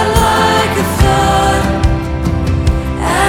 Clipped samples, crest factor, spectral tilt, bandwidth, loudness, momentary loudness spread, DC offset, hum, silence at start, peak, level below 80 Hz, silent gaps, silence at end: under 0.1%; 12 dB; -5 dB/octave; 17.5 kHz; -13 LUFS; 6 LU; under 0.1%; none; 0 s; 0 dBFS; -20 dBFS; none; 0 s